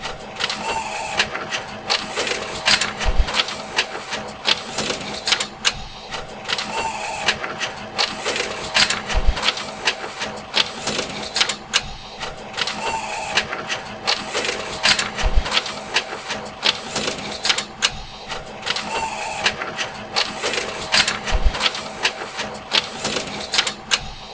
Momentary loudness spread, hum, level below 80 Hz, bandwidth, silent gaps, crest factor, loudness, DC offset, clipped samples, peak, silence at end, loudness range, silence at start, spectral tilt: 10 LU; none; -32 dBFS; 8 kHz; none; 24 dB; -21 LUFS; under 0.1%; under 0.1%; 0 dBFS; 0 s; 2 LU; 0 s; -1.5 dB/octave